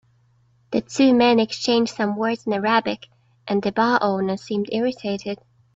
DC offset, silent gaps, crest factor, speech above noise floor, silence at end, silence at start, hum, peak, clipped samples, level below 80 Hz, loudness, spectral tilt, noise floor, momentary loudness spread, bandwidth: under 0.1%; none; 18 dB; 39 dB; 0.4 s; 0.7 s; none; -4 dBFS; under 0.1%; -62 dBFS; -21 LUFS; -5 dB/octave; -60 dBFS; 12 LU; 7.8 kHz